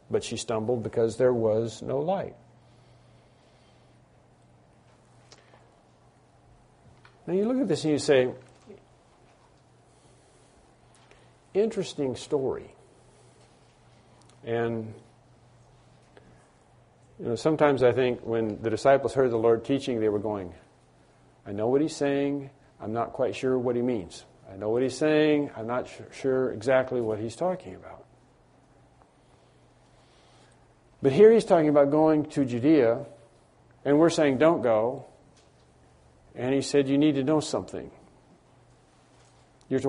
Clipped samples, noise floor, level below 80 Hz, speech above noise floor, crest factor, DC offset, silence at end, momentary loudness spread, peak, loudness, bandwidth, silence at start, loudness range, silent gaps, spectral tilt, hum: under 0.1%; -59 dBFS; -62 dBFS; 35 dB; 22 dB; under 0.1%; 0 s; 17 LU; -6 dBFS; -25 LUFS; 10.5 kHz; 0.1 s; 13 LU; none; -6 dB/octave; none